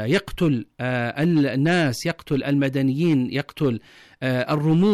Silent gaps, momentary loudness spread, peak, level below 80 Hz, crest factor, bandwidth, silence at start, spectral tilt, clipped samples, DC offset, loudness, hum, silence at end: none; 6 LU; -12 dBFS; -50 dBFS; 10 dB; 14.5 kHz; 0 s; -7 dB/octave; under 0.1%; under 0.1%; -22 LUFS; none; 0 s